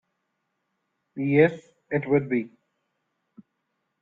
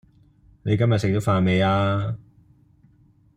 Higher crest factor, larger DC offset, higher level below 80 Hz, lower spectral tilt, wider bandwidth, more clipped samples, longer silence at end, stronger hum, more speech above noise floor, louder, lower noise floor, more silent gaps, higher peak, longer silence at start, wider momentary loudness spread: about the same, 22 dB vs 18 dB; neither; second, -66 dBFS vs -52 dBFS; first, -9.5 dB/octave vs -7.5 dB/octave; second, 7.4 kHz vs 11.5 kHz; neither; first, 1.55 s vs 1.2 s; neither; first, 55 dB vs 37 dB; about the same, -24 LUFS vs -22 LUFS; first, -78 dBFS vs -57 dBFS; neither; about the same, -6 dBFS vs -6 dBFS; first, 1.15 s vs 0.65 s; first, 22 LU vs 12 LU